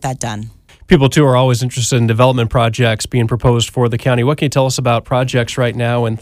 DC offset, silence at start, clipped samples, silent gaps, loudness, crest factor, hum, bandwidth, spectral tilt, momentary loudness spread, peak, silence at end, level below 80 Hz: under 0.1%; 0 s; under 0.1%; none; -14 LUFS; 14 dB; none; 15 kHz; -5.5 dB/octave; 5 LU; 0 dBFS; 0 s; -36 dBFS